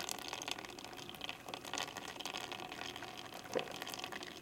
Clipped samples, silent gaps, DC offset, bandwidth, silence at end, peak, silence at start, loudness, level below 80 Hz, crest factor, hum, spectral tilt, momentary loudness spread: under 0.1%; none; under 0.1%; 17 kHz; 0 s; -20 dBFS; 0 s; -44 LUFS; -74 dBFS; 26 dB; none; -2 dB/octave; 6 LU